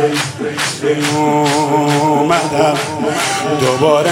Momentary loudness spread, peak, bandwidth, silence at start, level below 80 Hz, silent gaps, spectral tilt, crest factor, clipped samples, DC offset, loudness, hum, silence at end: 5 LU; 0 dBFS; 16.5 kHz; 0 s; -56 dBFS; none; -4.5 dB/octave; 14 dB; under 0.1%; under 0.1%; -14 LUFS; none; 0 s